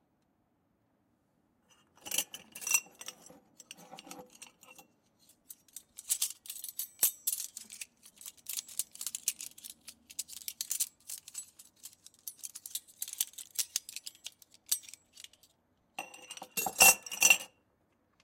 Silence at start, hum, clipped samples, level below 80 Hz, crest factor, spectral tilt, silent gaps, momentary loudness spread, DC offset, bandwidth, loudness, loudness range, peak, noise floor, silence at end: 2.05 s; none; under 0.1%; -74 dBFS; 28 dB; 1.5 dB/octave; none; 25 LU; under 0.1%; 17 kHz; -31 LUFS; 12 LU; -8 dBFS; -75 dBFS; 0.75 s